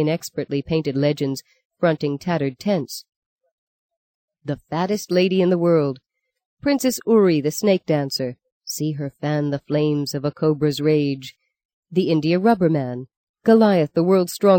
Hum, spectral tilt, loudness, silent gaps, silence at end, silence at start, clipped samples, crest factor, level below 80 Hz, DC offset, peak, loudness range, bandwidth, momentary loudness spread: none; -6 dB/octave; -20 LUFS; 1.65-1.70 s, 3.16-3.39 s, 3.52-3.89 s, 3.97-4.28 s, 6.46-6.57 s, 8.52-8.61 s, 11.65-11.83 s, 13.16-13.34 s; 0 s; 0 s; under 0.1%; 16 dB; -60 dBFS; under 0.1%; -4 dBFS; 6 LU; 17 kHz; 13 LU